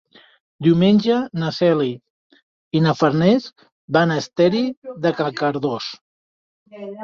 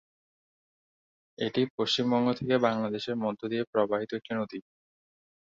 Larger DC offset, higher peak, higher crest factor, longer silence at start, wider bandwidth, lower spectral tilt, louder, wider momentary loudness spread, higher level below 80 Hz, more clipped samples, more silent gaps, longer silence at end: neither; first, -2 dBFS vs -10 dBFS; about the same, 18 dB vs 20 dB; second, 0.6 s vs 1.4 s; about the same, 7.2 kHz vs 7.6 kHz; first, -7 dB/octave vs -5.5 dB/octave; first, -19 LUFS vs -29 LUFS; first, 12 LU vs 8 LU; first, -60 dBFS vs -70 dBFS; neither; first, 2.10-2.30 s, 2.42-2.71 s, 3.72-3.88 s, 4.77-4.82 s, 6.01-6.66 s vs 1.70-1.78 s, 3.67-3.73 s; second, 0 s vs 0.95 s